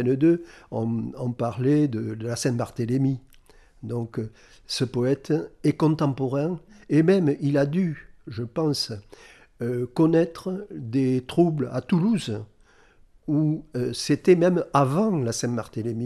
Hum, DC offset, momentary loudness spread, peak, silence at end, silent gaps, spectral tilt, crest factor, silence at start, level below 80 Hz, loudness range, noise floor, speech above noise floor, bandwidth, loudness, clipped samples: none; under 0.1%; 13 LU; -6 dBFS; 0 s; none; -6.5 dB/octave; 18 dB; 0 s; -56 dBFS; 3 LU; -55 dBFS; 32 dB; 13.5 kHz; -24 LUFS; under 0.1%